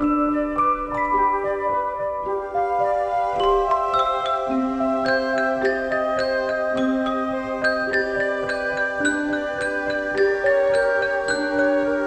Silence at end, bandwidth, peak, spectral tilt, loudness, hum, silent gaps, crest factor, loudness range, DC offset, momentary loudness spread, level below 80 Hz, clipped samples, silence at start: 0 s; 9.4 kHz; -8 dBFS; -4.5 dB/octave; -22 LUFS; none; none; 14 dB; 1 LU; under 0.1%; 4 LU; -46 dBFS; under 0.1%; 0 s